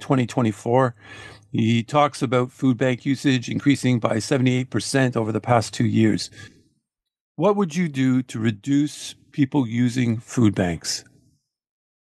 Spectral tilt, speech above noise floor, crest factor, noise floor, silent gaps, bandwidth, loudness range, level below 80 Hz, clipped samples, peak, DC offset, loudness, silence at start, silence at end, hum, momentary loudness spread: -6 dB/octave; 55 dB; 20 dB; -76 dBFS; 7.21-7.35 s; 12.5 kHz; 2 LU; -58 dBFS; under 0.1%; -2 dBFS; under 0.1%; -22 LUFS; 0 s; 1.05 s; none; 7 LU